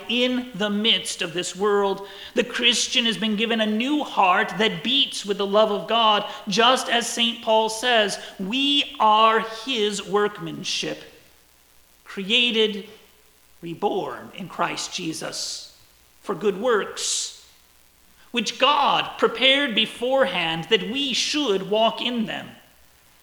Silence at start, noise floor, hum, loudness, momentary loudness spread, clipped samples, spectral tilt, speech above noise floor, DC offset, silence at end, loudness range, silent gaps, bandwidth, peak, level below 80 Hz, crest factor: 0 s; -56 dBFS; none; -21 LUFS; 11 LU; under 0.1%; -2.5 dB/octave; 33 dB; under 0.1%; 0.7 s; 7 LU; none; over 20 kHz; -2 dBFS; -62 dBFS; 20 dB